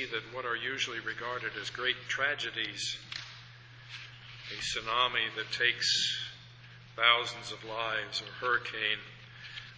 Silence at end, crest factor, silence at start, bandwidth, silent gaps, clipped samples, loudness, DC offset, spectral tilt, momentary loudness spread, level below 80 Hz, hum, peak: 0 s; 26 dB; 0 s; 8 kHz; none; under 0.1%; -31 LUFS; under 0.1%; -1.5 dB/octave; 20 LU; -66 dBFS; none; -8 dBFS